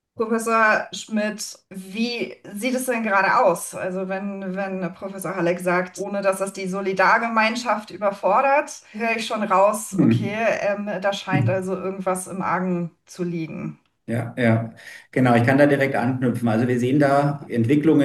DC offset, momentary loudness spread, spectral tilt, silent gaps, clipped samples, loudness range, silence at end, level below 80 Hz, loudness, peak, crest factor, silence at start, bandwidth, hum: under 0.1%; 12 LU; -6 dB/octave; none; under 0.1%; 5 LU; 0 s; -68 dBFS; -22 LUFS; -4 dBFS; 18 dB; 0.2 s; 12.5 kHz; none